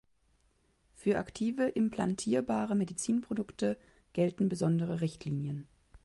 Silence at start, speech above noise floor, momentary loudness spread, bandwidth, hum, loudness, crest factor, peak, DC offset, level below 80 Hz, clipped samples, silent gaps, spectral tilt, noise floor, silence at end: 1 s; 39 dB; 7 LU; 11.5 kHz; none; -33 LUFS; 16 dB; -18 dBFS; under 0.1%; -64 dBFS; under 0.1%; none; -6.5 dB/octave; -71 dBFS; 0.05 s